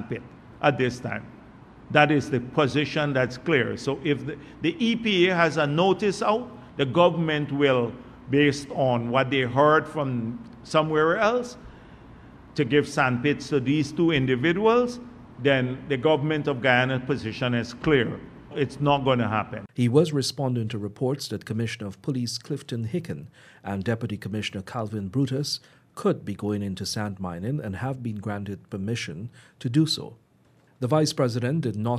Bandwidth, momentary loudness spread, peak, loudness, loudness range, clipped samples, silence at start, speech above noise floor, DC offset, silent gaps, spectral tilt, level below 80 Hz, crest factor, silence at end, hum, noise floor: 14 kHz; 12 LU; -4 dBFS; -25 LUFS; 7 LU; under 0.1%; 0 s; 35 dB; under 0.1%; none; -6 dB/octave; -56 dBFS; 22 dB; 0 s; none; -60 dBFS